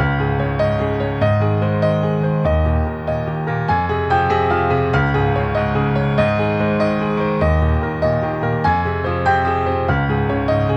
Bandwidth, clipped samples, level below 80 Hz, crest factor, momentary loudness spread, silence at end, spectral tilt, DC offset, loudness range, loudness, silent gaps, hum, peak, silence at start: 8 kHz; under 0.1%; -28 dBFS; 14 dB; 3 LU; 0 s; -8.5 dB/octave; under 0.1%; 1 LU; -18 LUFS; none; none; -2 dBFS; 0 s